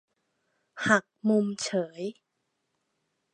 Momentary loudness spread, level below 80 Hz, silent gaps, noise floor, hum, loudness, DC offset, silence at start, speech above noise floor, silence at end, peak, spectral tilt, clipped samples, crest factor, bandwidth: 12 LU; -78 dBFS; none; -80 dBFS; none; -28 LUFS; under 0.1%; 0.75 s; 52 dB; 1.2 s; -6 dBFS; -4.5 dB/octave; under 0.1%; 26 dB; 10.5 kHz